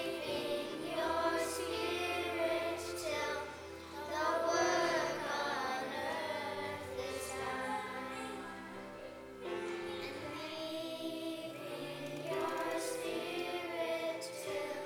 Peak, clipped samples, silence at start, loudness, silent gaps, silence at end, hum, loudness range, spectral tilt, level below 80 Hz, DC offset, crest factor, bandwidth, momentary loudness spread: -20 dBFS; under 0.1%; 0 s; -38 LUFS; none; 0 s; none; 7 LU; -3 dB/octave; -68 dBFS; under 0.1%; 18 dB; over 20 kHz; 10 LU